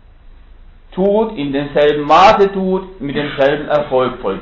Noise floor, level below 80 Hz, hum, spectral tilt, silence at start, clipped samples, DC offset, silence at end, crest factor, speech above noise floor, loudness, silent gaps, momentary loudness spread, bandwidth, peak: -40 dBFS; -40 dBFS; none; -6.5 dB/octave; 0.25 s; under 0.1%; under 0.1%; 0 s; 14 dB; 26 dB; -14 LUFS; none; 12 LU; 7.6 kHz; 0 dBFS